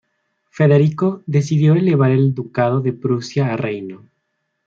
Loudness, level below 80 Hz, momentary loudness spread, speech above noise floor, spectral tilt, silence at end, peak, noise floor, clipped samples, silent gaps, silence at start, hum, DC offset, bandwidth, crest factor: -17 LUFS; -60 dBFS; 8 LU; 56 dB; -8.5 dB/octave; 0.7 s; -2 dBFS; -72 dBFS; under 0.1%; none; 0.6 s; none; under 0.1%; 7.4 kHz; 14 dB